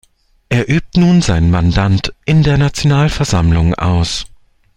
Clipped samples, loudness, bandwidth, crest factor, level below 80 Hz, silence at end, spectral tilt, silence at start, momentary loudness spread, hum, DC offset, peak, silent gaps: under 0.1%; -13 LUFS; 11 kHz; 12 dB; -28 dBFS; 0.5 s; -6 dB/octave; 0.5 s; 6 LU; none; under 0.1%; 0 dBFS; none